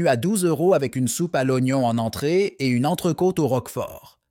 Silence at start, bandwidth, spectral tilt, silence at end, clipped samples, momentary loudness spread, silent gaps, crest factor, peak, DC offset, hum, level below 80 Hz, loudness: 0 s; 17 kHz; -6 dB/octave; 0.3 s; under 0.1%; 4 LU; none; 16 dB; -6 dBFS; under 0.1%; none; -58 dBFS; -22 LUFS